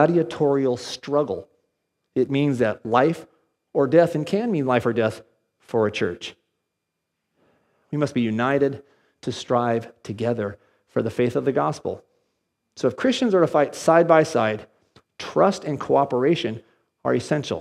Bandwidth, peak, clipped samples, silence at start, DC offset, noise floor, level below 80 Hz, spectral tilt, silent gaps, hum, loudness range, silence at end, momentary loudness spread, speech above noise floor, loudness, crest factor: 13.5 kHz; -2 dBFS; under 0.1%; 0 s; under 0.1%; -80 dBFS; -66 dBFS; -6.5 dB/octave; none; none; 6 LU; 0 s; 13 LU; 58 dB; -22 LUFS; 20 dB